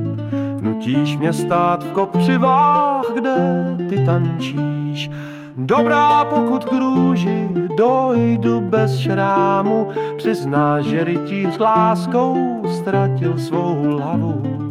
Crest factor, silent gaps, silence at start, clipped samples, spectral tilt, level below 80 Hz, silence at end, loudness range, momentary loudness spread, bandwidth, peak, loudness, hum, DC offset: 12 dB; none; 0 s; under 0.1%; -7.5 dB/octave; -56 dBFS; 0 s; 2 LU; 8 LU; 13 kHz; -4 dBFS; -17 LUFS; none; under 0.1%